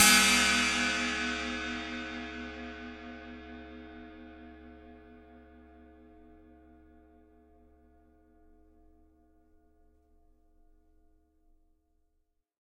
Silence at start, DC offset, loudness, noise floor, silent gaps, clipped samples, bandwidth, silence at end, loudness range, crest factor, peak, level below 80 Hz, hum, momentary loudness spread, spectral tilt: 0 s; under 0.1%; -28 LUFS; -77 dBFS; none; under 0.1%; 15.5 kHz; 7.25 s; 28 LU; 26 dB; -8 dBFS; -56 dBFS; none; 28 LU; -1 dB/octave